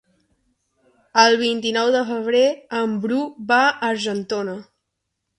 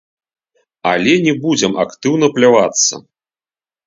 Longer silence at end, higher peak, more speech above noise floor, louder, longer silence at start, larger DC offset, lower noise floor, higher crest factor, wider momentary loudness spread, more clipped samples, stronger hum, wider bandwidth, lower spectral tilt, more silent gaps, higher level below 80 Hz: about the same, 0.75 s vs 0.85 s; about the same, -2 dBFS vs 0 dBFS; second, 58 dB vs over 77 dB; second, -19 LUFS vs -13 LUFS; first, 1.15 s vs 0.85 s; neither; second, -78 dBFS vs under -90 dBFS; about the same, 20 dB vs 16 dB; first, 10 LU vs 7 LU; neither; neither; first, 11 kHz vs 7.8 kHz; about the same, -3.5 dB/octave vs -3.5 dB/octave; neither; second, -68 dBFS vs -58 dBFS